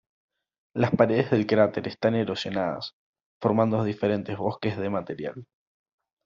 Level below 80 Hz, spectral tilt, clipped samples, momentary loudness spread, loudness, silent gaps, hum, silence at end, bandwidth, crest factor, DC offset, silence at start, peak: -64 dBFS; -5.5 dB/octave; under 0.1%; 13 LU; -26 LUFS; 2.93-3.13 s, 3.26-3.41 s; none; 0.8 s; 7.4 kHz; 22 dB; under 0.1%; 0.75 s; -4 dBFS